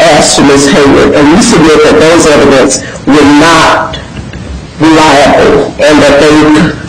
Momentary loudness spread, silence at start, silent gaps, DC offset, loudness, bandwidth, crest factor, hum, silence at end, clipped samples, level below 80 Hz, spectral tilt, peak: 11 LU; 0 s; none; 2%; -3 LUFS; 15.5 kHz; 4 dB; none; 0 s; 2%; -26 dBFS; -4 dB/octave; 0 dBFS